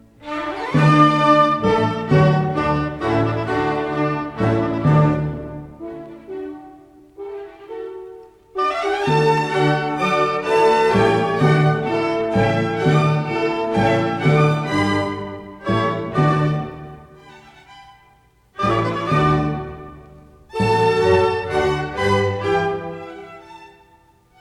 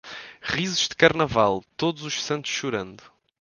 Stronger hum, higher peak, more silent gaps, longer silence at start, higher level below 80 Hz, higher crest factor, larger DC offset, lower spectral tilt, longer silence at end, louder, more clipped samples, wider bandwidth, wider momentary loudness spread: neither; about the same, 0 dBFS vs 0 dBFS; neither; first, 0.2 s vs 0.05 s; first, -44 dBFS vs -54 dBFS; second, 18 dB vs 24 dB; neither; first, -7 dB/octave vs -3.5 dB/octave; first, 0.75 s vs 0.45 s; first, -18 LUFS vs -23 LUFS; neither; about the same, 10.5 kHz vs 10.5 kHz; first, 18 LU vs 13 LU